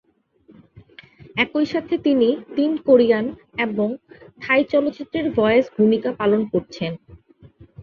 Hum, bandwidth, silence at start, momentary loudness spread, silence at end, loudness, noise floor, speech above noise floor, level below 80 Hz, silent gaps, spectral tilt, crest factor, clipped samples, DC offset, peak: none; 7 kHz; 0.75 s; 13 LU; 0 s; -20 LUFS; -55 dBFS; 36 dB; -56 dBFS; none; -7 dB/octave; 18 dB; under 0.1%; under 0.1%; -4 dBFS